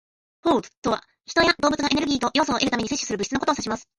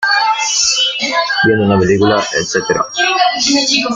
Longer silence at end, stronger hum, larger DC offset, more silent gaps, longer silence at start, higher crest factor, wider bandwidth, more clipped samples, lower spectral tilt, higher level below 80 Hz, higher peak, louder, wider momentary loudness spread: first, 0.15 s vs 0 s; neither; neither; first, 0.77-0.82 s vs none; first, 0.45 s vs 0 s; first, 18 dB vs 12 dB; about the same, 11.5 kHz vs 11 kHz; neither; about the same, -3 dB/octave vs -2.5 dB/octave; about the same, -50 dBFS vs -46 dBFS; second, -6 dBFS vs 0 dBFS; second, -23 LUFS vs -12 LUFS; first, 7 LU vs 4 LU